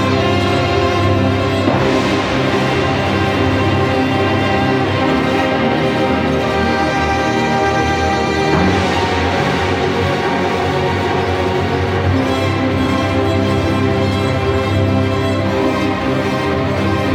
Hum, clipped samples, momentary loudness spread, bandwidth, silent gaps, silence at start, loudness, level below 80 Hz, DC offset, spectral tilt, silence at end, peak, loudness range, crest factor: none; under 0.1%; 2 LU; 14 kHz; none; 0 s; -15 LUFS; -34 dBFS; under 0.1%; -6 dB/octave; 0 s; -2 dBFS; 1 LU; 14 dB